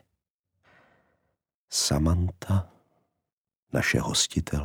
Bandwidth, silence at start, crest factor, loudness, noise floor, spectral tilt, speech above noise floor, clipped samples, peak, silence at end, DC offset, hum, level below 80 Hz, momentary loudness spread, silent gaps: 18 kHz; 1.7 s; 20 dB; -26 LUFS; -88 dBFS; -4 dB/octave; 63 dB; under 0.1%; -10 dBFS; 0 s; under 0.1%; none; -42 dBFS; 6 LU; 3.32-3.45 s, 3.56-3.67 s